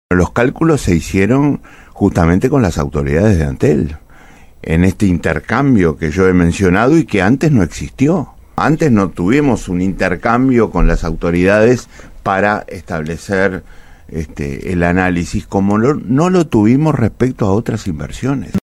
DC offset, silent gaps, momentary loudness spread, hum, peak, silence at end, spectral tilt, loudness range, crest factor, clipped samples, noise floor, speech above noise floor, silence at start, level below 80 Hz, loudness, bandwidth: under 0.1%; none; 9 LU; none; 0 dBFS; 0.1 s; -7 dB/octave; 4 LU; 14 dB; under 0.1%; -39 dBFS; 26 dB; 0.1 s; -28 dBFS; -14 LUFS; 13.5 kHz